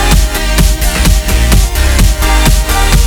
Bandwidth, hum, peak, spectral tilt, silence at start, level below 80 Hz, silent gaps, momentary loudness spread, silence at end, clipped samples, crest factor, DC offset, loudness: over 20 kHz; none; 0 dBFS; -4 dB/octave; 0 s; -10 dBFS; none; 1 LU; 0 s; 0.2%; 8 dB; under 0.1%; -10 LUFS